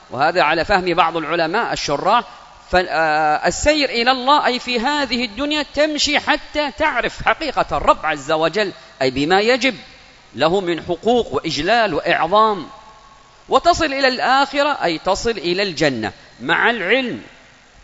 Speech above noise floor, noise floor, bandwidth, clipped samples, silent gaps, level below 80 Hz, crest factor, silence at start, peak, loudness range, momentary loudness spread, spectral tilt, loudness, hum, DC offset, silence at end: 28 dB; -46 dBFS; 8 kHz; under 0.1%; none; -42 dBFS; 18 dB; 0.1 s; 0 dBFS; 2 LU; 6 LU; -3.5 dB/octave; -17 LUFS; none; under 0.1%; 0.6 s